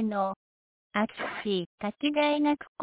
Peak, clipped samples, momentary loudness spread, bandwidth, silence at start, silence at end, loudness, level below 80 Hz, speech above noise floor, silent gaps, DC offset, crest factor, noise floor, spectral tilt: -14 dBFS; under 0.1%; 9 LU; 4 kHz; 0 s; 0 s; -29 LUFS; -70 dBFS; over 61 dB; 0.36-0.90 s, 1.66-1.78 s, 2.68-2.75 s; under 0.1%; 16 dB; under -90 dBFS; -3.5 dB/octave